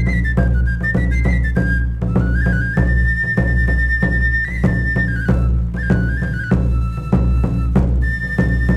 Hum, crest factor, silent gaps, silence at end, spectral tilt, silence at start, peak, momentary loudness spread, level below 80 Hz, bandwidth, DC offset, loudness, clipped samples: none; 14 dB; none; 0 s; -8.5 dB/octave; 0 s; -2 dBFS; 3 LU; -18 dBFS; 5.8 kHz; 0.6%; -17 LUFS; under 0.1%